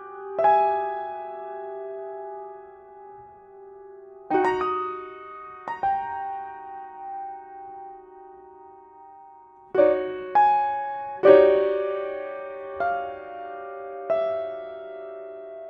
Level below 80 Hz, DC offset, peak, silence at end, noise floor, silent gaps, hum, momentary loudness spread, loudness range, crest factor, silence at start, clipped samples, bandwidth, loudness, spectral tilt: -64 dBFS; under 0.1%; -2 dBFS; 0 s; -49 dBFS; none; none; 25 LU; 15 LU; 24 dB; 0 s; under 0.1%; 5.8 kHz; -24 LUFS; -6.5 dB/octave